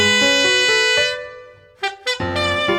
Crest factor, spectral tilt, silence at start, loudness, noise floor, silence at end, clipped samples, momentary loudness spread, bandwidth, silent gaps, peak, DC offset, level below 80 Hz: 14 dB; -2 dB/octave; 0 s; -16 LUFS; -41 dBFS; 0 s; under 0.1%; 13 LU; over 20 kHz; none; -4 dBFS; under 0.1%; -50 dBFS